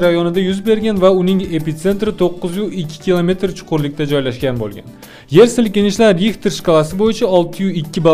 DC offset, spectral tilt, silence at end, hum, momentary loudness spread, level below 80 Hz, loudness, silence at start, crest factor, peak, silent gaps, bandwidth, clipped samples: under 0.1%; -6 dB/octave; 0 s; none; 9 LU; -40 dBFS; -15 LUFS; 0 s; 14 dB; 0 dBFS; none; 15.5 kHz; under 0.1%